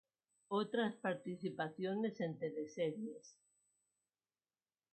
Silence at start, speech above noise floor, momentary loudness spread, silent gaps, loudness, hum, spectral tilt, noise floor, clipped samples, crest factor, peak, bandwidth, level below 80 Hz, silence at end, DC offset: 0.5 s; over 49 dB; 7 LU; none; -42 LUFS; none; -6.5 dB/octave; under -90 dBFS; under 0.1%; 18 dB; -24 dBFS; 8.2 kHz; under -90 dBFS; 1.65 s; under 0.1%